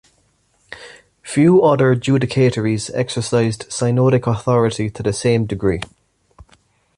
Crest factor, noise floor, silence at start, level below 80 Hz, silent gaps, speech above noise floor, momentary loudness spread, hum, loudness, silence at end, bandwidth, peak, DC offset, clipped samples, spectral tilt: 14 dB; -60 dBFS; 0.7 s; -46 dBFS; none; 45 dB; 19 LU; none; -17 LUFS; 1.1 s; 11.5 kHz; -2 dBFS; under 0.1%; under 0.1%; -6.5 dB/octave